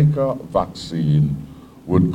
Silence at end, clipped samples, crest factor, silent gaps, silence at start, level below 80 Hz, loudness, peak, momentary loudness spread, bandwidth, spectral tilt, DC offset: 0 s; under 0.1%; 16 dB; none; 0 s; -42 dBFS; -21 LUFS; -4 dBFS; 15 LU; 8.6 kHz; -9 dB/octave; under 0.1%